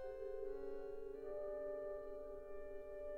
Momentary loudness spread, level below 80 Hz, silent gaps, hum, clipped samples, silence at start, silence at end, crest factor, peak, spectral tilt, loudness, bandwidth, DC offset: 6 LU; -60 dBFS; none; none; under 0.1%; 0 s; 0 s; 12 dB; -36 dBFS; -7.5 dB/octave; -49 LUFS; 5.6 kHz; under 0.1%